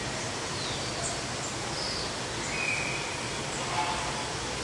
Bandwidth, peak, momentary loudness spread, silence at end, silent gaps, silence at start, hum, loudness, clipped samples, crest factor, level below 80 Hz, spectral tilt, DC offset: 11.5 kHz; -16 dBFS; 4 LU; 0 s; none; 0 s; none; -31 LUFS; under 0.1%; 16 dB; -50 dBFS; -2.5 dB/octave; under 0.1%